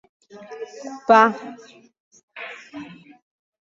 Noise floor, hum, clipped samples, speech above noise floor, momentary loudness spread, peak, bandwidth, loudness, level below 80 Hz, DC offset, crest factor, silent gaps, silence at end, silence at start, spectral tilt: -39 dBFS; none; under 0.1%; 19 dB; 24 LU; -2 dBFS; 7.6 kHz; -17 LUFS; -68 dBFS; under 0.1%; 22 dB; 2.00-2.11 s, 2.23-2.28 s; 0.8 s; 0.5 s; -4.5 dB/octave